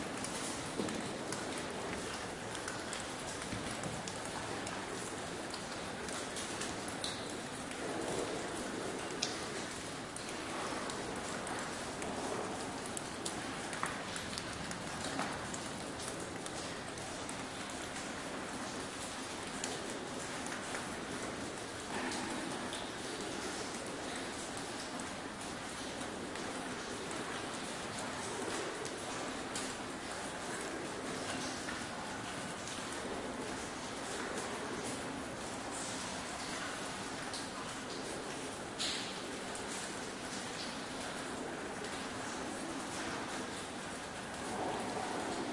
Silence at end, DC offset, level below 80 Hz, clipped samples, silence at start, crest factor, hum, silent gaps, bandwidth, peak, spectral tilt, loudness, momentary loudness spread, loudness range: 0 s; under 0.1%; -64 dBFS; under 0.1%; 0 s; 28 dB; none; none; 12 kHz; -14 dBFS; -3 dB/octave; -41 LUFS; 3 LU; 1 LU